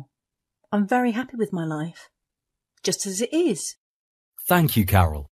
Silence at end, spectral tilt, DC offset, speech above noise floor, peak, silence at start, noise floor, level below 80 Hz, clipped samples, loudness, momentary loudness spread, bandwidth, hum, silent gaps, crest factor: 0.1 s; -5 dB/octave; under 0.1%; 62 dB; -2 dBFS; 0 s; -85 dBFS; -44 dBFS; under 0.1%; -23 LUFS; 11 LU; 14 kHz; none; 3.77-4.32 s; 24 dB